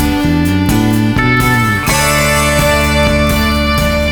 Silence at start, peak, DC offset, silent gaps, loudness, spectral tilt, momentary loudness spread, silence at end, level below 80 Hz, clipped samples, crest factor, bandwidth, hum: 0 s; 0 dBFS; under 0.1%; none; -11 LUFS; -4.5 dB/octave; 2 LU; 0 s; -20 dBFS; under 0.1%; 10 dB; 19.5 kHz; none